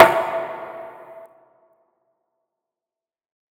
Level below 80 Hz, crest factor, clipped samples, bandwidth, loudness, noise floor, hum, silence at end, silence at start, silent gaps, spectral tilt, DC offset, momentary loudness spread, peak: -66 dBFS; 24 dB; 0.2%; over 20 kHz; -21 LUFS; -90 dBFS; none; 2.4 s; 0 s; none; -4.5 dB/octave; under 0.1%; 24 LU; 0 dBFS